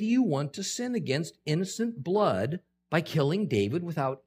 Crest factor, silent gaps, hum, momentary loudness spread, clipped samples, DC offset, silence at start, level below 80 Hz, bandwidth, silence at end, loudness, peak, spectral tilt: 18 dB; none; none; 6 LU; under 0.1%; under 0.1%; 0 s; -72 dBFS; 15.5 kHz; 0.1 s; -29 LUFS; -10 dBFS; -5.5 dB/octave